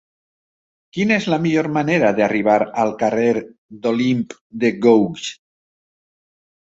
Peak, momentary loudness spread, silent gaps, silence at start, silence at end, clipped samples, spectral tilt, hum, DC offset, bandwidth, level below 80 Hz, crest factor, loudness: -2 dBFS; 10 LU; 3.58-3.69 s, 4.41-4.50 s; 0.95 s; 1.3 s; under 0.1%; -6 dB/octave; none; under 0.1%; 8 kHz; -60 dBFS; 18 dB; -18 LUFS